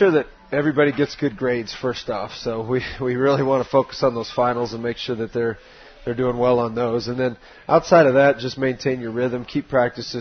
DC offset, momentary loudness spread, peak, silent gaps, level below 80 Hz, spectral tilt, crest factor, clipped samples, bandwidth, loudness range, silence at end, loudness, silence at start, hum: under 0.1%; 10 LU; -2 dBFS; none; -50 dBFS; -6.5 dB/octave; 20 dB; under 0.1%; 6.6 kHz; 4 LU; 0 s; -21 LUFS; 0 s; none